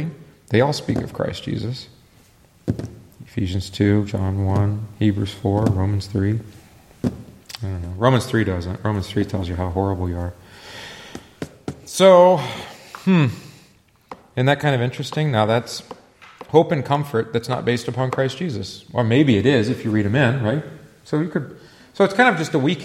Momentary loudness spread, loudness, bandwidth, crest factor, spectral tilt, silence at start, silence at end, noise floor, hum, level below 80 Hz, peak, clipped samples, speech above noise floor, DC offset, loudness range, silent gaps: 18 LU; -20 LUFS; 14.5 kHz; 20 dB; -6.5 dB/octave; 0 s; 0 s; -54 dBFS; none; -48 dBFS; 0 dBFS; under 0.1%; 35 dB; under 0.1%; 6 LU; none